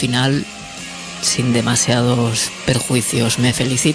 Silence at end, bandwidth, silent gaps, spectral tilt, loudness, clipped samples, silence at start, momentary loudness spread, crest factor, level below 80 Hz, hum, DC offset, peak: 0 s; 11 kHz; none; -4 dB/octave; -16 LUFS; under 0.1%; 0 s; 13 LU; 16 dB; -44 dBFS; none; under 0.1%; 0 dBFS